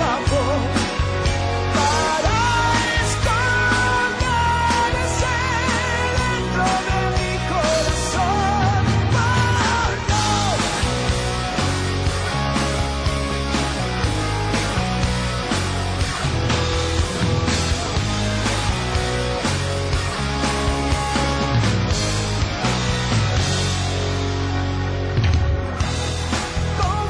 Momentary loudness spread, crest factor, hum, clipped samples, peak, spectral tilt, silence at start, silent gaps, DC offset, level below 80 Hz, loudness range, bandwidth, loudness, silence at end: 5 LU; 12 dB; none; under 0.1%; -8 dBFS; -4.5 dB/octave; 0 s; none; under 0.1%; -28 dBFS; 3 LU; 10.5 kHz; -20 LUFS; 0 s